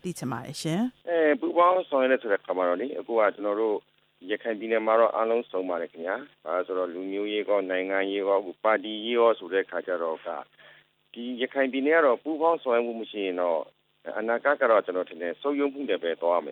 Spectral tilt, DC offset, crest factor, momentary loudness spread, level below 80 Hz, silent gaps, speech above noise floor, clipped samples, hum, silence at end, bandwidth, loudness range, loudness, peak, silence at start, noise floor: -5.5 dB/octave; under 0.1%; 18 dB; 11 LU; -78 dBFS; none; 30 dB; under 0.1%; none; 0 s; 13.5 kHz; 3 LU; -26 LUFS; -8 dBFS; 0.05 s; -57 dBFS